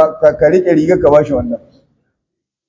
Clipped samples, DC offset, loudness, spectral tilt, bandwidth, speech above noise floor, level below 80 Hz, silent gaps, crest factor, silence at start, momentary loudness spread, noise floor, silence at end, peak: 0.3%; under 0.1%; -11 LUFS; -8 dB/octave; 7.6 kHz; 66 dB; -38 dBFS; none; 12 dB; 0 s; 11 LU; -77 dBFS; 1.1 s; 0 dBFS